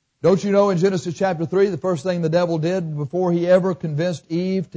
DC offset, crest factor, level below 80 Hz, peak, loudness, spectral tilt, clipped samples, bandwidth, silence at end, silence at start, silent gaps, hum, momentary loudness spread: under 0.1%; 14 dB; -60 dBFS; -6 dBFS; -20 LUFS; -7 dB/octave; under 0.1%; 8 kHz; 0.1 s; 0.25 s; none; none; 7 LU